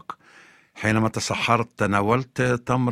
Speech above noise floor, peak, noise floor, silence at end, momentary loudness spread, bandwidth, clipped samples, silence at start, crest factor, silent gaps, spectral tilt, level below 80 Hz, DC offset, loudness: 30 dB; -2 dBFS; -52 dBFS; 0 s; 5 LU; 14.5 kHz; under 0.1%; 0.1 s; 20 dB; none; -5.5 dB/octave; -52 dBFS; under 0.1%; -23 LUFS